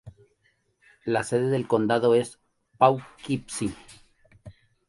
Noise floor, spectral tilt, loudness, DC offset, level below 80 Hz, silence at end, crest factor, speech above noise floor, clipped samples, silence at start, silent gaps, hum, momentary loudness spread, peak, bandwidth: -69 dBFS; -6 dB/octave; -25 LUFS; under 0.1%; -60 dBFS; 0.4 s; 22 dB; 45 dB; under 0.1%; 0.05 s; none; none; 12 LU; -4 dBFS; 11.5 kHz